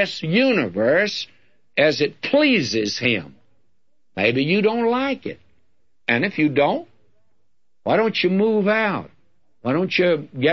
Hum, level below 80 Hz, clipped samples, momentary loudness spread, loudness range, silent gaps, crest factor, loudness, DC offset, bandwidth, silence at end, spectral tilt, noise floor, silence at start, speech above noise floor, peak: none; -64 dBFS; under 0.1%; 11 LU; 3 LU; none; 18 dB; -20 LUFS; 0.2%; 7.6 kHz; 0 s; -5.5 dB/octave; -76 dBFS; 0 s; 56 dB; -4 dBFS